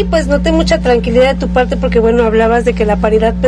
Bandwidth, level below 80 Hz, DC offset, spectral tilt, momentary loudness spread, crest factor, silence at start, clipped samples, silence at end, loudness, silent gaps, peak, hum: 11 kHz; -20 dBFS; under 0.1%; -6.5 dB/octave; 3 LU; 10 dB; 0 s; under 0.1%; 0 s; -11 LUFS; none; 0 dBFS; none